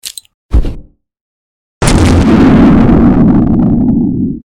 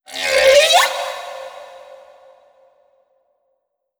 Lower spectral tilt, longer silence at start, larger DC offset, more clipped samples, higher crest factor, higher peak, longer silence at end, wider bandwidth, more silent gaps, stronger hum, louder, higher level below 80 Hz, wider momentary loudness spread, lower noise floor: first, -7 dB/octave vs 1.5 dB/octave; about the same, 0.05 s vs 0.1 s; neither; neither; second, 8 dB vs 20 dB; about the same, 0 dBFS vs 0 dBFS; second, 0.15 s vs 2.35 s; second, 16 kHz vs over 20 kHz; first, 0.34-0.49 s, 1.21-1.81 s vs none; neither; first, -8 LUFS vs -13 LUFS; first, -18 dBFS vs -56 dBFS; second, 11 LU vs 24 LU; second, -29 dBFS vs -71 dBFS